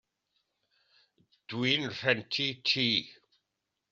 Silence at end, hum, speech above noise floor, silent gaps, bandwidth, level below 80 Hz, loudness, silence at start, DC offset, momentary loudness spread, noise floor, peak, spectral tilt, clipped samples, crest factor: 0.8 s; none; 54 dB; none; 7.8 kHz; -74 dBFS; -29 LUFS; 1.5 s; under 0.1%; 8 LU; -85 dBFS; -10 dBFS; -2 dB/octave; under 0.1%; 24 dB